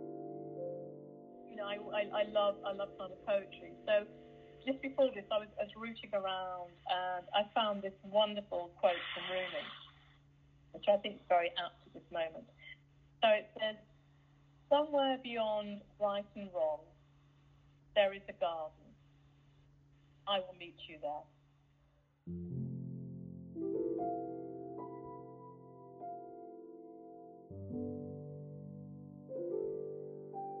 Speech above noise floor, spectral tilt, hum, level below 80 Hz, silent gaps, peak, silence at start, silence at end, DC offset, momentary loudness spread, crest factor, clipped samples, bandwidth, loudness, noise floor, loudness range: 34 dB; -7 dB/octave; none; -72 dBFS; none; -18 dBFS; 0 s; 0 s; under 0.1%; 20 LU; 22 dB; under 0.1%; 4.7 kHz; -38 LUFS; -71 dBFS; 10 LU